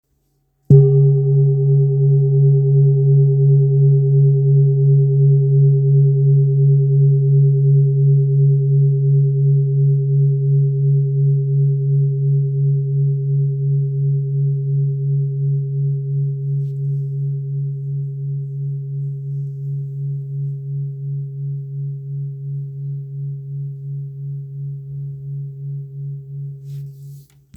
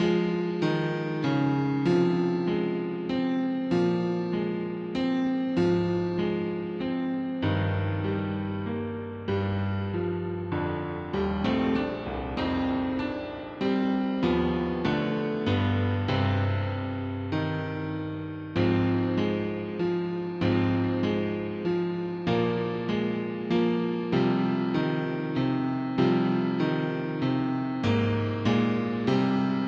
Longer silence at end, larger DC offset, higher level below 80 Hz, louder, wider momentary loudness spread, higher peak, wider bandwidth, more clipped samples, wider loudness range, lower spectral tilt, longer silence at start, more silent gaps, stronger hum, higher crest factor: first, 0.35 s vs 0 s; neither; second, -58 dBFS vs -52 dBFS; first, -16 LUFS vs -28 LUFS; first, 15 LU vs 7 LU; first, 0 dBFS vs -12 dBFS; second, 0.8 kHz vs 7.2 kHz; neither; first, 14 LU vs 3 LU; first, -15 dB/octave vs -8 dB/octave; first, 0.7 s vs 0 s; neither; neither; about the same, 16 dB vs 16 dB